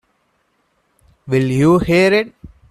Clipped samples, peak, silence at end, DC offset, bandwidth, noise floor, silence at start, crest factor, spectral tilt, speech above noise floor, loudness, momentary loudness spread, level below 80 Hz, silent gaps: under 0.1%; -2 dBFS; 0.25 s; under 0.1%; 14 kHz; -64 dBFS; 1.25 s; 16 dB; -7 dB/octave; 50 dB; -14 LUFS; 7 LU; -42 dBFS; none